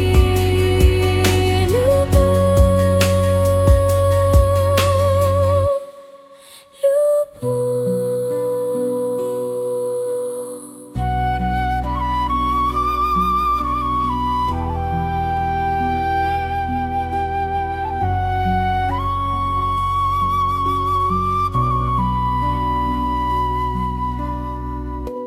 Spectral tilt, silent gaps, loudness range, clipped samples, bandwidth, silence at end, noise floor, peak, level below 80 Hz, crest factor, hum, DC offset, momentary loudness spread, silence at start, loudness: -6.5 dB/octave; none; 6 LU; under 0.1%; 16 kHz; 0 s; -44 dBFS; -2 dBFS; -26 dBFS; 16 dB; none; under 0.1%; 8 LU; 0 s; -18 LUFS